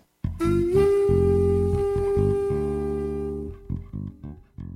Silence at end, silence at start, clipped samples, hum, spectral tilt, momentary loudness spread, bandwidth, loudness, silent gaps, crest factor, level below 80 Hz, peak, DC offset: 0 s; 0.25 s; under 0.1%; none; -9 dB/octave; 16 LU; 11.5 kHz; -23 LUFS; none; 14 dB; -36 dBFS; -8 dBFS; under 0.1%